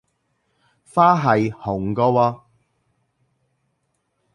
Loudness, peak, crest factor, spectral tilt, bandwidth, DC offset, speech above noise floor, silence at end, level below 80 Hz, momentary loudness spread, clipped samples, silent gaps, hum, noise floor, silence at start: -19 LUFS; -2 dBFS; 20 dB; -8 dB/octave; 11.5 kHz; under 0.1%; 54 dB; 2 s; -54 dBFS; 10 LU; under 0.1%; none; none; -71 dBFS; 0.95 s